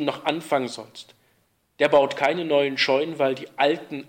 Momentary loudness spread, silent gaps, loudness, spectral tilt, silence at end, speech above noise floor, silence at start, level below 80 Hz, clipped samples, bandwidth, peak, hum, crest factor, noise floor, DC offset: 13 LU; none; -22 LUFS; -4.5 dB/octave; 0.05 s; 44 dB; 0 s; -72 dBFS; under 0.1%; 16.5 kHz; -6 dBFS; none; 18 dB; -67 dBFS; under 0.1%